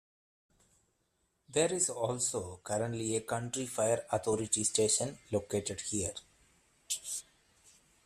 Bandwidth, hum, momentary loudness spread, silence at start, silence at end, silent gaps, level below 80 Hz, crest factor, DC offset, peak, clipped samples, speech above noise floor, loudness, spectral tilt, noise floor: 14.5 kHz; none; 9 LU; 1.5 s; 0.85 s; none; -68 dBFS; 20 dB; under 0.1%; -16 dBFS; under 0.1%; 44 dB; -33 LUFS; -3.5 dB/octave; -78 dBFS